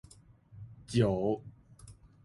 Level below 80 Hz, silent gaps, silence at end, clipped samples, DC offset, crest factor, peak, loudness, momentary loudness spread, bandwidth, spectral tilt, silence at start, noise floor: -56 dBFS; none; 0.3 s; under 0.1%; under 0.1%; 20 dB; -14 dBFS; -32 LUFS; 23 LU; 11.5 kHz; -7 dB/octave; 0.55 s; -58 dBFS